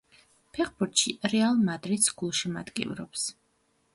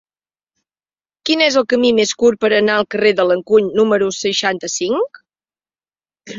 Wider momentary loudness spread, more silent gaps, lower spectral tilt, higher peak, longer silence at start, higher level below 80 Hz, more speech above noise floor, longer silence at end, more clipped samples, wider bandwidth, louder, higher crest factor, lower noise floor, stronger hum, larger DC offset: first, 9 LU vs 6 LU; neither; about the same, -3 dB/octave vs -3 dB/octave; second, -8 dBFS vs 0 dBFS; second, 0.55 s vs 1.25 s; about the same, -64 dBFS vs -60 dBFS; second, 42 dB vs over 75 dB; first, 0.6 s vs 0 s; neither; first, 12 kHz vs 7.8 kHz; second, -28 LUFS vs -15 LUFS; first, 22 dB vs 16 dB; second, -71 dBFS vs under -90 dBFS; neither; neither